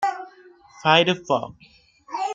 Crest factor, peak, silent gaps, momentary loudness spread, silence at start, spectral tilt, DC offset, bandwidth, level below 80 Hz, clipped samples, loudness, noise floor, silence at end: 22 dB; -2 dBFS; none; 21 LU; 0 s; -4.5 dB/octave; under 0.1%; 9.2 kHz; -66 dBFS; under 0.1%; -21 LUFS; -50 dBFS; 0 s